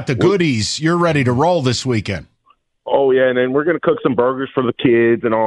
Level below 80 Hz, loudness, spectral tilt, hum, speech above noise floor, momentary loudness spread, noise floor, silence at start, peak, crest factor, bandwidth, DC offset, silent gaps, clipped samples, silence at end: -50 dBFS; -16 LUFS; -5.5 dB/octave; none; 43 dB; 6 LU; -58 dBFS; 0 s; -2 dBFS; 14 dB; 11 kHz; under 0.1%; none; under 0.1%; 0 s